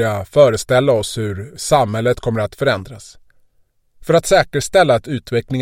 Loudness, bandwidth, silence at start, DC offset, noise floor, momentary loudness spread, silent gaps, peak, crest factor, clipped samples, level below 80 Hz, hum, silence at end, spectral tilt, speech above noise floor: -16 LUFS; 16.5 kHz; 0 s; under 0.1%; -59 dBFS; 11 LU; none; 0 dBFS; 16 dB; under 0.1%; -42 dBFS; none; 0 s; -5 dB/octave; 44 dB